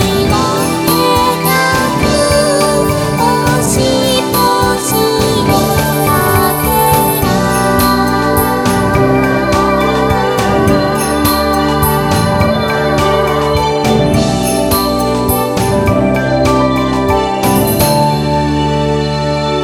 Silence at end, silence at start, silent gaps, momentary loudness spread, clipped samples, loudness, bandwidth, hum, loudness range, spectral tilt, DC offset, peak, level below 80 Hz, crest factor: 0 s; 0 s; none; 3 LU; under 0.1%; -11 LUFS; 19.5 kHz; none; 1 LU; -5 dB/octave; under 0.1%; 0 dBFS; -26 dBFS; 12 dB